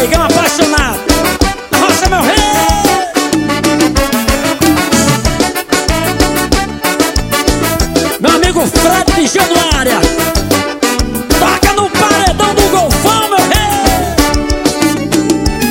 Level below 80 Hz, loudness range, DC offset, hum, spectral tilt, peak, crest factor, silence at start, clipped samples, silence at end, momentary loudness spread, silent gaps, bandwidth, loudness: -20 dBFS; 2 LU; 0.3%; none; -3.5 dB/octave; 0 dBFS; 10 dB; 0 s; 0.2%; 0 s; 4 LU; none; 17.5 kHz; -10 LUFS